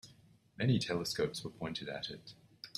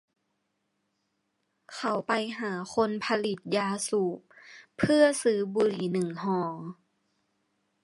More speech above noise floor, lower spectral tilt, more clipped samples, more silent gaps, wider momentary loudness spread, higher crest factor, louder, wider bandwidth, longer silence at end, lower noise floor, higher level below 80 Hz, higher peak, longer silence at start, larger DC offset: second, 27 dB vs 51 dB; about the same, -5 dB/octave vs -5 dB/octave; neither; neither; first, 18 LU vs 13 LU; about the same, 18 dB vs 20 dB; second, -37 LUFS vs -28 LUFS; first, 13.5 kHz vs 11.5 kHz; second, 0.1 s vs 1.1 s; second, -64 dBFS vs -78 dBFS; about the same, -68 dBFS vs -68 dBFS; second, -20 dBFS vs -10 dBFS; second, 0.05 s vs 1.7 s; neither